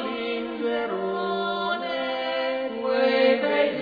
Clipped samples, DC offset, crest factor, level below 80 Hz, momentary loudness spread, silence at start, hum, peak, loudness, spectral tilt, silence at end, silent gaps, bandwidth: under 0.1%; under 0.1%; 16 dB; -64 dBFS; 8 LU; 0 s; none; -10 dBFS; -25 LUFS; -6.5 dB/octave; 0 s; none; 5 kHz